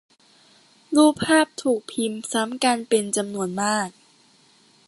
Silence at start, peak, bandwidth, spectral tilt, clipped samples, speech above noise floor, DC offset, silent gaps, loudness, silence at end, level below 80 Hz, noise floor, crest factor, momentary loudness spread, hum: 0.9 s; -4 dBFS; 12 kHz; -3.5 dB/octave; under 0.1%; 35 dB; under 0.1%; none; -22 LUFS; 1 s; -64 dBFS; -57 dBFS; 20 dB; 9 LU; none